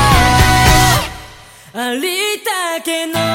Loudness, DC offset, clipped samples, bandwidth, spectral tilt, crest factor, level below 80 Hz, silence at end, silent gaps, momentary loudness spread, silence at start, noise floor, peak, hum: -13 LUFS; under 0.1%; under 0.1%; 17 kHz; -3.5 dB/octave; 14 dB; -22 dBFS; 0 s; none; 14 LU; 0 s; -38 dBFS; 0 dBFS; none